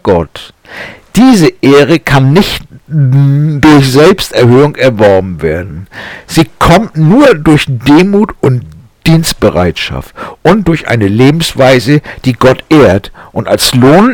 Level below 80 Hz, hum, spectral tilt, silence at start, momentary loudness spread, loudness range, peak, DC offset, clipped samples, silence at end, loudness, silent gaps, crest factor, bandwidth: -30 dBFS; none; -6 dB/octave; 0.05 s; 14 LU; 3 LU; 0 dBFS; under 0.1%; 1%; 0 s; -7 LUFS; none; 6 dB; 18.5 kHz